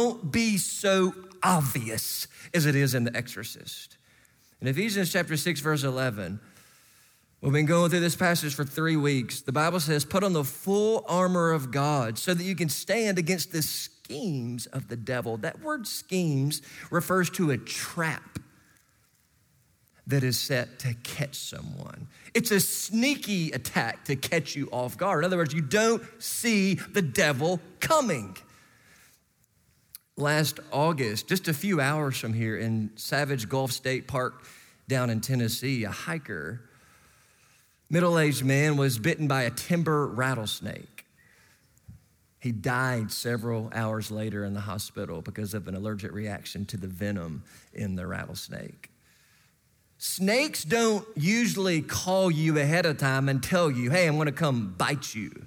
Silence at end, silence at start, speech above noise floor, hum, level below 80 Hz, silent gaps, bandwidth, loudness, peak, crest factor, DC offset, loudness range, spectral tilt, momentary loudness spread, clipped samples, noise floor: 0 s; 0 s; 40 dB; none; -64 dBFS; none; over 20 kHz; -27 LUFS; -8 dBFS; 20 dB; under 0.1%; 7 LU; -4.5 dB/octave; 11 LU; under 0.1%; -67 dBFS